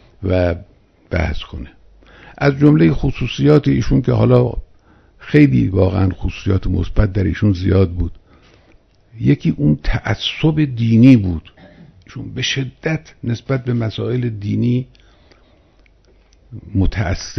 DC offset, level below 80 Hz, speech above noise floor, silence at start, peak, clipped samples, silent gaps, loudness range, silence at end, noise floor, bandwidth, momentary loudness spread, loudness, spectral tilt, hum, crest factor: under 0.1%; -30 dBFS; 36 dB; 0.2 s; 0 dBFS; under 0.1%; none; 7 LU; 0 s; -51 dBFS; 6.4 kHz; 13 LU; -16 LUFS; -7.5 dB/octave; none; 16 dB